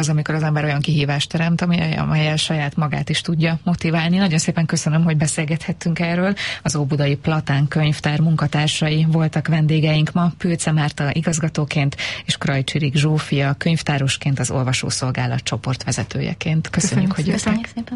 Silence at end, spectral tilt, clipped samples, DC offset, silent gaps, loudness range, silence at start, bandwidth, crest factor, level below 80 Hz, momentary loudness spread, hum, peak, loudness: 0 s; -5 dB/octave; under 0.1%; under 0.1%; none; 2 LU; 0 s; 11.5 kHz; 14 dB; -46 dBFS; 4 LU; none; -6 dBFS; -19 LUFS